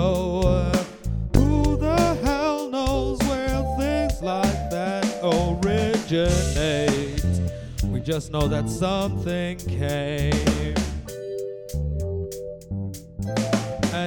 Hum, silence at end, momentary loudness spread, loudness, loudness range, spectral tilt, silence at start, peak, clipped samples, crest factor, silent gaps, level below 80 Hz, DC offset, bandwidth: none; 0 s; 10 LU; -24 LUFS; 4 LU; -6 dB/octave; 0 s; -2 dBFS; under 0.1%; 22 dB; none; -32 dBFS; under 0.1%; 18 kHz